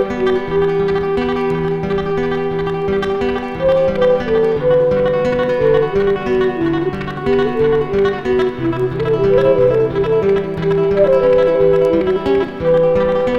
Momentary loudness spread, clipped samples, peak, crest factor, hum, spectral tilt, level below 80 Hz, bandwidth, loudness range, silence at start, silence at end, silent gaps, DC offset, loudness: 6 LU; under 0.1%; -2 dBFS; 12 dB; none; -8 dB/octave; -36 dBFS; 7 kHz; 4 LU; 0 s; 0 s; none; under 0.1%; -15 LUFS